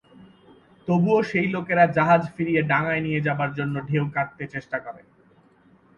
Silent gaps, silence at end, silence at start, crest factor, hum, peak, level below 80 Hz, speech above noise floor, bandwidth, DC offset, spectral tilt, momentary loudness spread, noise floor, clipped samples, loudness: none; 1 s; 0.2 s; 18 dB; none; -6 dBFS; -60 dBFS; 34 dB; 7.2 kHz; under 0.1%; -8.5 dB/octave; 12 LU; -57 dBFS; under 0.1%; -23 LUFS